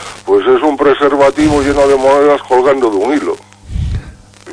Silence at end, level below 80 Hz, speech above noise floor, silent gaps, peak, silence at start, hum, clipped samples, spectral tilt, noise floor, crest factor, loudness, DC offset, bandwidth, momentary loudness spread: 0 s; -28 dBFS; 24 dB; none; 0 dBFS; 0 s; none; under 0.1%; -6 dB/octave; -33 dBFS; 10 dB; -11 LUFS; under 0.1%; 10.5 kHz; 12 LU